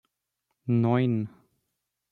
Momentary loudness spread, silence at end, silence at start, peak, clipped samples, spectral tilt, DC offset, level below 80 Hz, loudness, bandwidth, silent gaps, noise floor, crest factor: 15 LU; 0.85 s; 0.65 s; -12 dBFS; under 0.1%; -10.5 dB/octave; under 0.1%; -70 dBFS; -26 LUFS; 4.3 kHz; none; -81 dBFS; 18 dB